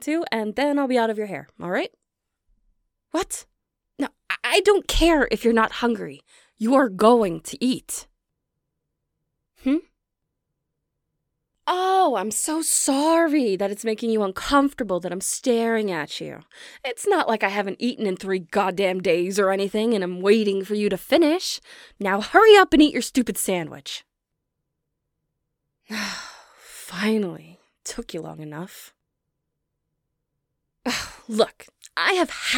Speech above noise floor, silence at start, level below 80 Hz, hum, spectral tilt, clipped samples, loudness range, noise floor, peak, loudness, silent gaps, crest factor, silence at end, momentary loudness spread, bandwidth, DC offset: 59 dB; 0 s; -44 dBFS; none; -3.5 dB/octave; under 0.1%; 14 LU; -80 dBFS; 0 dBFS; -22 LUFS; none; 22 dB; 0 s; 15 LU; 19 kHz; under 0.1%